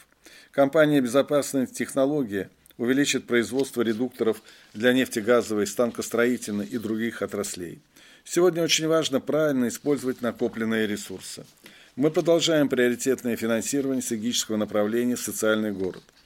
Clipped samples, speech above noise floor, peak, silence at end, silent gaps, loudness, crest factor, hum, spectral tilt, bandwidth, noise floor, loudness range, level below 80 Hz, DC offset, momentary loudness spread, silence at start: under 0.1%; 28 dB; -6 dBFS; 0.25 s; none; -25 LUFS; 20 dB; none; -4 dB/octave; 16.5 kHz; -52 dBFS; 2 LU; -68 dBFS; under 0.1%; 10 LU; 0.55 s